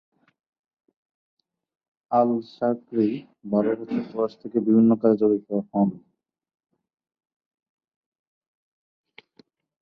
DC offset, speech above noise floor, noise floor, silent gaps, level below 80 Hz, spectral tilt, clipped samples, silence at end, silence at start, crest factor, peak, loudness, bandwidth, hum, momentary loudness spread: under 0.1%; 38 dB; -60 dBFS; none; -70 dBFS; -10.5 dB/octave; under 0.1%; 3.85 s; 2.1 s; 20 dB; -6 dBFS; -23 LUFS; 5.2 kHz; none; 9 LU